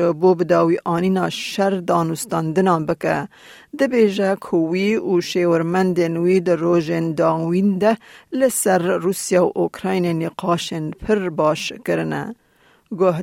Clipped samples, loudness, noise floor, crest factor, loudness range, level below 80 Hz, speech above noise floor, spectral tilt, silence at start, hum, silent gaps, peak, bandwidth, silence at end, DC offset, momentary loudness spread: under 0.1%; -19 LUFS; -49 dBFS; 14 dB; 2 LU; -56 dBFS; 30 dB; -5.5 dB/octave; 0 s; none; none; -4 dBFS; 16.5 kHz; 0 s; under 0.1%; 6 LU